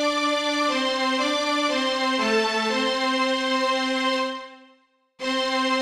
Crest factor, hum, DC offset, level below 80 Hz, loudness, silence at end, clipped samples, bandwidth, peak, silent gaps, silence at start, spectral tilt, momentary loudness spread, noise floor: 14 dB; none; under 0.1%; -64 dBFS; -23 LUFS; 0 s; under 0.1%; 15 kHz; -10 dBFS; none; 0 s; -2 dB/octave; 5 LU; -61 dBFS